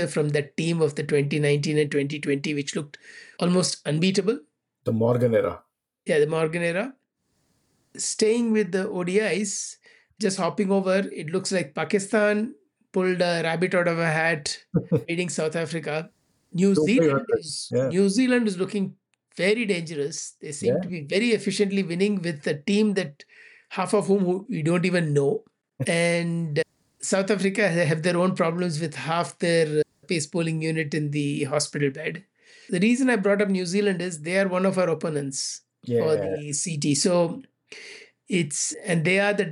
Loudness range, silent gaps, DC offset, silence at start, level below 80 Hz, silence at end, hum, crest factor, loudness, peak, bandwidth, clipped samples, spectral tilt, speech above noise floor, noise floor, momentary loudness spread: 2 LU; none; under 0.1%; 0 s; -68 dBFS; 0 s; none; 14 dB; -24 LUFS; -10 dBFS; 11.5 kHz; under 0.1%; -5 dB/octave; 49 dB; -72 dBFS; 9 LU